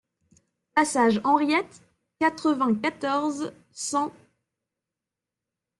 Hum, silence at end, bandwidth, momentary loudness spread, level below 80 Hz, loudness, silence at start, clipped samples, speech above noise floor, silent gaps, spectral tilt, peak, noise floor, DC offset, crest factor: none; 1.7 s; 12 kHz; 12 LU; -70 dBFS; -25 LUFS; 0.75 s; under 0.1%; 64 dB; none; -4 dB/octave; -8 dBFS; -88 dBFS; under 0.1%; 18 dB